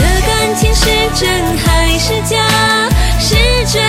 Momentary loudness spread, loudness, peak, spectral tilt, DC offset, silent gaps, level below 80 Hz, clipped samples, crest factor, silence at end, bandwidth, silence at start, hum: 3 LU; -11 LUFS; 0 dBFS; -3.5 dB/octave; under 0.1%; none; -16 dBFS; under 0.1%; 10 dB; 0 s; 16.5 kHz; 0 s; none